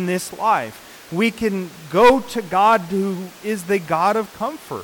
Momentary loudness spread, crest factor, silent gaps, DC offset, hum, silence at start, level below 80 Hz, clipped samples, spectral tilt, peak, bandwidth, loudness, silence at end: 14 LU; 14 dB; none; under 0.1%; none; 0 s; -50 dBFS; under 0.1%; -5 dB/octave; -6 dBFS; 19 kHz; -19 LUFS; 0 s